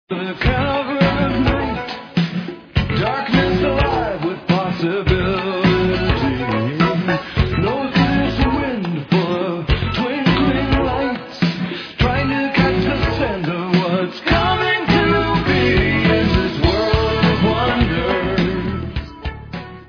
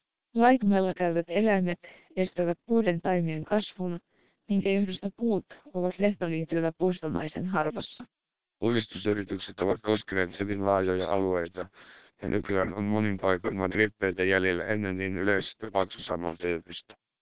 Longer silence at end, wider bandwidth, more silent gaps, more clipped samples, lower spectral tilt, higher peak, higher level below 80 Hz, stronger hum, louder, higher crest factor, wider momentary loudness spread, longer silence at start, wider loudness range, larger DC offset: about the same, 0.05 s vs 0.05 s; first, 5.4 kHz vs 4 kHz; neither; neither; second, -7.5 dB/octave vs -10.5 dB/octave; first, 0 dBFS vs -8 dBFS; first, -28 dBFS vs -56 dBFS; neither; first, -18 LUFS vs -29 LUFS; about the same, 16 dB vs 20 dB; about the same, 8 LU vs 10 LU; about the same, 0.1 s vs 0 s; about the same, 3 LU vs 3 LU; second, under 0.1% vs 0.3%